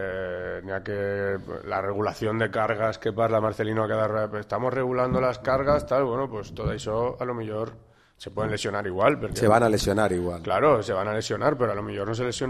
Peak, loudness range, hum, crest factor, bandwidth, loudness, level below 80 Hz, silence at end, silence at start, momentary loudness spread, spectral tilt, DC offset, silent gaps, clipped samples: -4 dBFS; 5 LU; none; 20 dB; 14.5 kHz; -26 LUFS; -46 dBFS; 0 s; 0 s; 10 LU; -6 dB/octave; under 0.1%; none; under 0.1%